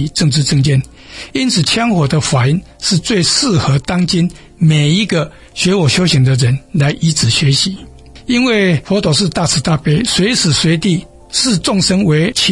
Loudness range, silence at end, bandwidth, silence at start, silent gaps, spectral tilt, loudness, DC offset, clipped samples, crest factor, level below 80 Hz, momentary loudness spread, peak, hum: 1 LU; 0 s; 11.5 kHz; 0 s; none; -4.5 dB/octave; -13 LUFS; under 0.1%; under 0.1%; 12 dB; -38 dBFS; 6 LU; 0 dBFS; none